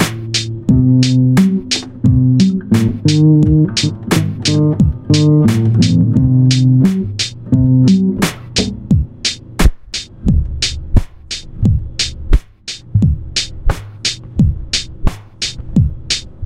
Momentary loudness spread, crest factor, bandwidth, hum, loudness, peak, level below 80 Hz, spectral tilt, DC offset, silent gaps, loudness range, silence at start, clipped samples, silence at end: 9 LU; 12 dB; 15 kHz; none; -14 LUFS; 0 dBFS; -22 dBFS; -5.5 dB/octave; under 0.1%; none; 6 LU; 0 s; under 0.1%; 0 s